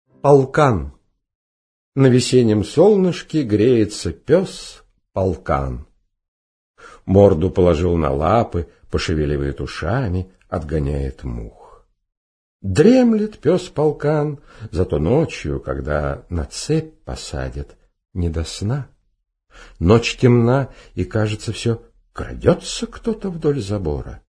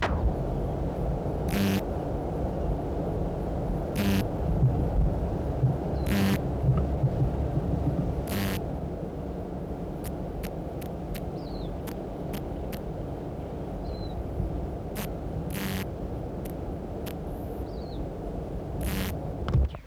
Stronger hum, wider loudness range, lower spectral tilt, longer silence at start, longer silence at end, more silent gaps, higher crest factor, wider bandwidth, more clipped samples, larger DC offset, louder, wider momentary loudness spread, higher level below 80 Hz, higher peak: neither; about the same, 8 LU vs 8 LU; about the same, -6.5 dB/octave vs -7 dB/octave; first, 0.25 s vs 0 s; about the same, 0.1 s vs 0 s; first, 1.35-1.92 s, 6.28-6.74 s, 12.17-12.60 s vs none; about the same, 18 dB vs 16 dB; second, 10.5 kHz vs 17.5 kHz; neither; neither; first, -19 LUFS vs -31 LUFS; first, 16 LU vs 9 LU; about the same, -34 dBFS vs -34 dBFS; first, 0 dBFS vs -14 dBFS